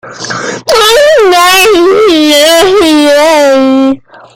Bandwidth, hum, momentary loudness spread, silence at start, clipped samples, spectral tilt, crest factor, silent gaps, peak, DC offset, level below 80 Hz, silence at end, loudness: over 20 kHz; none; 11 LU; 0.05 s; 0.8%; -2 dB/octave; 6 dB; none; 0 dBFS; under 0.1%; -40 dBFS; 0.35 s; -5 LUFS